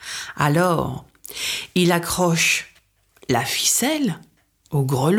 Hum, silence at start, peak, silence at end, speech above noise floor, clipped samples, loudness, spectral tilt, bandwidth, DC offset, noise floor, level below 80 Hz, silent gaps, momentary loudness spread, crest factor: none; 0 s; -4 dBFS; 0 s; 39 dB; under 0.1%; -20 LUFS; -4 dB/octave; 18 kHz; under 0.1%; -58 dBFS; -50 dBFS; none; 13 LU; 18 dB